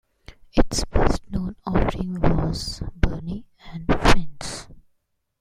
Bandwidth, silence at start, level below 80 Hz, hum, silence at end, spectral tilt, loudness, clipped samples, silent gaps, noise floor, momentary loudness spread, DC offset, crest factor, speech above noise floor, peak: 12 kHz; 0.3 s; -28 dBFS; none; 0.6 s; -5.5 dB/octave; -25 LUFS; under 0.1%; none; -71 dBFS; 13 LU; under 0.1%; 20 dB; 47 dB; -2 dBFS